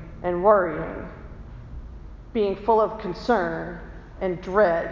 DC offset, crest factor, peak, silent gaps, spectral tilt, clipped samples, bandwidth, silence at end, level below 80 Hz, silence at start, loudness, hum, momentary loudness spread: under 0.1%; 20 dB; -4 dBFS; none; -7.5 dB/octave; under 0.1%; 7.2 kHz; 0 s; -42 dBFS; 0 s; -23 LUFS; none; 23 LU